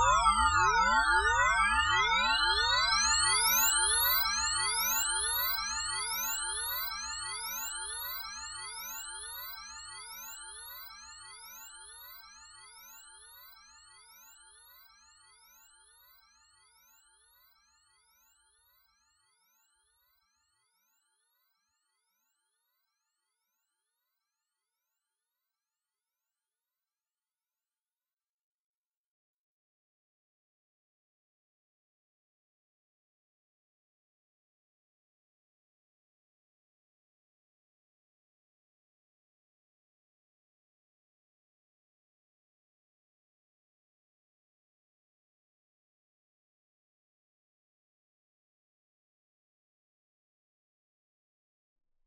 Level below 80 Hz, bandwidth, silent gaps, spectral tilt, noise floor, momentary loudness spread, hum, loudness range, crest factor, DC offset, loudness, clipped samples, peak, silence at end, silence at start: -56 dBFS; 16 kHz; none; 0.5 dB/octave; under -90 dBFS; 23 LU; none; 23 LU; 24 dB; under 0.1%; -28 LUFS; under 0.1%; -14 dBFS; 38.55 s; 0 s